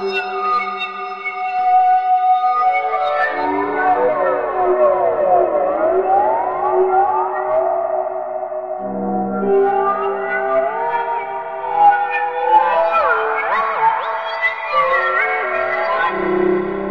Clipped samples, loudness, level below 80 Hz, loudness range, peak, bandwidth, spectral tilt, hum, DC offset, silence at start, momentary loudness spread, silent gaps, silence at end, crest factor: under 0.1%; -17 LUFS; -54 dBFS; 3 LU; -2 dBFS; 6.2 kHz; -7 dB/octave; none; 0.4%; 0 s; 8 LU; none; 0 s; 14 dB